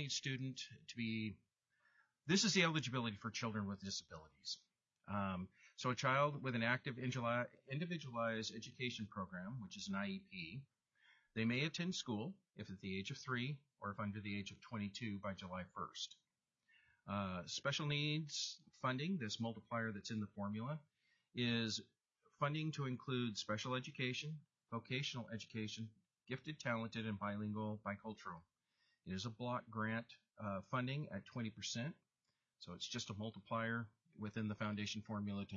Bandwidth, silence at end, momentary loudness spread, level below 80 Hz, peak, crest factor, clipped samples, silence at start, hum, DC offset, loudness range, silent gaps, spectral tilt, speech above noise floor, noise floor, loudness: 7.4 kHz; 0 s; 12 LU; -82 dBFS; -22 dBFS; 22 dB; under 0.1%; 0 s; none; under 0.1%; 6 LU; none; -4 dB/octave; 46 dB; -90 dBFS; -44 LUFS